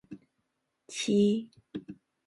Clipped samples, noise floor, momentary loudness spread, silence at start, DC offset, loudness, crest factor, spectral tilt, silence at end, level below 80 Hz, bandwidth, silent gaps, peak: under 0.1%; -80 dBFS; 25 LU; 0.1 s; under 0.1%; -29 LUFS; 18 dB; -5.5 dB/octave; 0.35 s; -74 dBFS; 11.5 kHz; none; -14 dBFS